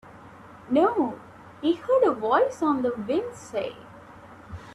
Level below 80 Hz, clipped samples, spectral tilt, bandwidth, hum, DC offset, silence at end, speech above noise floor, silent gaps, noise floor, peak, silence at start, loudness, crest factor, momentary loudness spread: -60 dBFS; under 0.1%; -6 dB/octave; 12 kHz; none; under 0.1%; 0 s; 23 dB; none; -47 dBFS; -8 dBFS; 0.05 s; -25 LUFS; 18 dB; 18 LU